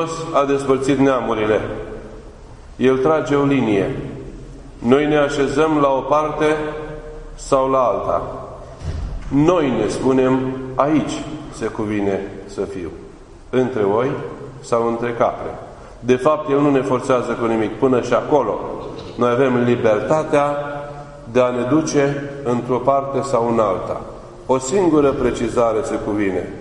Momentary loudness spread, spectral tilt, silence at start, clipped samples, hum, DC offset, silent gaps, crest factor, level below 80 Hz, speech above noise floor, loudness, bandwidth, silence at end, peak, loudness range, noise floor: 15 LU; -6.5 dB/octave; 0 s; under 0.1%; none; under 0.1%; none; 18 dB; -40 dBFS; 21 dB; -18 LUFS; 11 kHz; 0 s; 0 dBFS; 4 LU; -39 dBFS